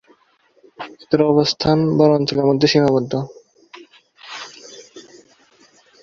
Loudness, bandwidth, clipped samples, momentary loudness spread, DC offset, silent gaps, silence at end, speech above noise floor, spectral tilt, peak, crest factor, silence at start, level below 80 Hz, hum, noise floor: -16 LUFS; 7.6 kHz; under 0.1%; 21 LU; under 0.1%; none; 1 s; 42 dB; -6 dB/octave; -2 dBFS; 18 dB; 0.8 s; -52 dBFS; none; -58 dBFS